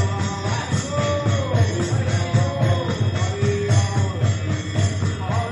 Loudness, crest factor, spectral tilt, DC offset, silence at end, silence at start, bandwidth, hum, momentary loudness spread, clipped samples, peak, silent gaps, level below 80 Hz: -21 LUFS; 14 dB; -6 dB/octave; under 0.1%; 0 s; 0 s; 10.5 kHz; none; 4 LU; under 0.1%; -6 dBFS; none; -44 dBFS